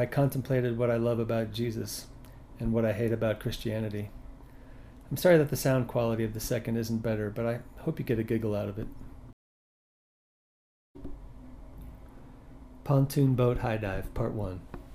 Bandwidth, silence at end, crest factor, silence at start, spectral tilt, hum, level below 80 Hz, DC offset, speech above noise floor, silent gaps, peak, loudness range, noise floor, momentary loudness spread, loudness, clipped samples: 15.5 kHz; 0 s; 20 dB; 0 s; -7 dB/octave; none; -48 dBFS; under 0.1%; over 61 dB; 9.33-10.95 s; -10 dBFS; 9 LU; under -90 dBFS; 23 LU; -30 LUFS; under 0.1%